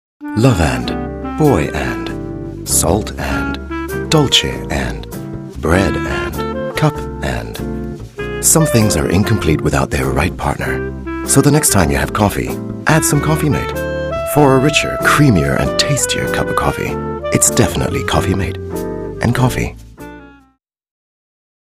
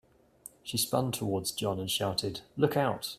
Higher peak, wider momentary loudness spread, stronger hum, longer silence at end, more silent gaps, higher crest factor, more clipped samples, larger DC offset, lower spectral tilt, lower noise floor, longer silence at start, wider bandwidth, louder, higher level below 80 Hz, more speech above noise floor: first, 0 dBFS vs -10 dBFS; about the same, 13 LU vs 12 LU; neither; first, 1.5 s vs 0 s; neither; second, 16 dB vs 22 dB; neither; neither; about the same, -4.5 dB/octave vs -4 dB/octave; about the same, -56 dBFS vs -54 dBFS; second, 0.2 s vs 0.45 s; about the same, 16 kHz vs 16 kHz; first, -15 LUFS vs -31 LUFS; first, -28 dBFS vs -64 dBFS; first, 42 dB vs 23 dB